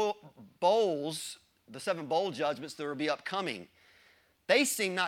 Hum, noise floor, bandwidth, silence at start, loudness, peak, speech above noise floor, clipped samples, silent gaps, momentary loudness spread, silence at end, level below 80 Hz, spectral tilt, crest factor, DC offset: none; -65 dBFS; 17 kHz; 0 s; -31 LUFS; -12 dBFS; 34 dB; under 0.1%; none; 17 LU; 0 s; -82 dBFS; -3 dB/octave; 22 dB; under 0.1%